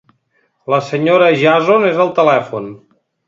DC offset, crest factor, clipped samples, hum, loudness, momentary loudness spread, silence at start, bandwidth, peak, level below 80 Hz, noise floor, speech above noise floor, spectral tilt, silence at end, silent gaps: under 0.1%; 14 dB; under 0.1%; none; -12 LUFS; 15 LU; 0.7 s; 7.6 kHz; 0 dBFS; -62 dBFS; -62 dBFS; 49 dB; -6.5 dB/octave; 0.5 s; none